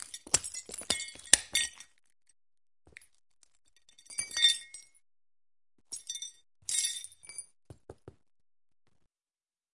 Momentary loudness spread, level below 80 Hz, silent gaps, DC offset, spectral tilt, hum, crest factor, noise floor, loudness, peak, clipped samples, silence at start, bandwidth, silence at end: 20 LU; -68 dBFS; none; under 0.1%; 1.5 dB/octave; none; 34 dB; under -90 dBFS; -30 LUFS; -2 dBFS; under 0.1%; 0 s; 11.5 kHz; 1.65 s